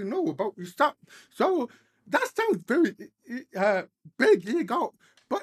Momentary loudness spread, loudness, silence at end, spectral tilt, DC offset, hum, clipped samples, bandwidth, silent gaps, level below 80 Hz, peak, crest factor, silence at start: 14 LU; -27 LUFS; 0 s; -5.5 dB/octave; under 0.1%; none; under 0.1%; 14.5 kHz; none; -82 dBFS; -8 dBFS; 20 dB; 0 s